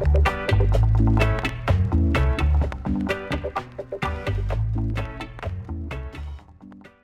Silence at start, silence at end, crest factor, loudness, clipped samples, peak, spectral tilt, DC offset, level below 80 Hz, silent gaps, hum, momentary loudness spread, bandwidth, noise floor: 0 s; 0.15 s; 16 dB; -24 LUFS; under 0.1%; -6 dBFS; -7.5 dB/octave; under 0.1%; -26 dBFS; none; none; 13 LU; 11 kHz; -46 dBFS